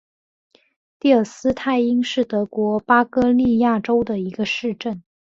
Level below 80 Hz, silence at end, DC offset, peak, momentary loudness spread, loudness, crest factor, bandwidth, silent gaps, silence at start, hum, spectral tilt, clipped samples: -52 dBFS; 0.4 s; under 0.1%; -2 dBFS; 8 LU; -19 LUFS; 18 dB; 7.6 kHz; none; 1.05 s; none; -6 dB/octave; under 0.1%